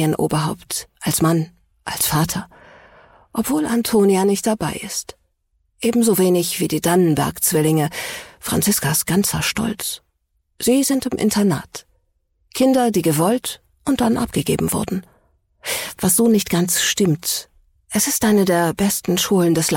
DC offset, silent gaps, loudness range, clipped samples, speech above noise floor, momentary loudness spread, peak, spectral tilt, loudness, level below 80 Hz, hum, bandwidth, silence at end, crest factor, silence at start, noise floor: under 0.1%; none; 3 LU; under 0.1%; 50 dB; 11 LU; -6 dBFS; -4.5 dB/octave; -19 LUFS; -48 dBFS; none; 17 kHz; 0 s; 14 dB; 0 s; -68 dBFS